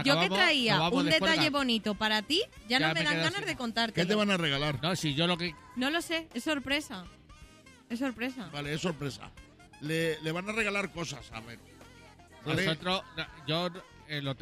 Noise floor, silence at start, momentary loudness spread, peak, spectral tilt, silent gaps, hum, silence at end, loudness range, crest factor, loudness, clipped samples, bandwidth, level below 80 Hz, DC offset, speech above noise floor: -55 dBFS; 0 s; 15 LU; -12 dBFS; -4 dB/octave; none; none; 0 s; 8 LU; 20 dB; -30 LUFS; under 0.1%; 15.5 kHz; -58 dBFS; under 0.1%; 24 dB